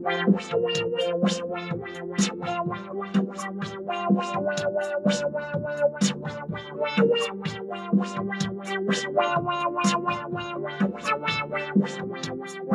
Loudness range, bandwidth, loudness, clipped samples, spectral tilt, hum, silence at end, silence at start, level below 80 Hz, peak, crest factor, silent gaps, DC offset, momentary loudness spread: 2 LU; 11.5 kHz; -27 LUFS; under 0.1%; -5 dB/octave; none; 0 s; 0 s; -64 dBFS; -8 dBFS; 18 dB; none; under 0.1%; 9 LU